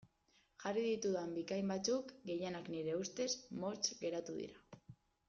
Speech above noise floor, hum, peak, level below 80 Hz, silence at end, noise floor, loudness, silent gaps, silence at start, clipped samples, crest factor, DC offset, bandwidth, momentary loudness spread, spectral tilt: 35 dB; none; -24 dBFS; -78 dBFS; 0.35 s; -76 dBFS; -41 LUFS; none; 0.6 s; under 0.1%; 18 dB; under 0.1%; 7.6 kHz; 10 LU; -4.5 dB/octave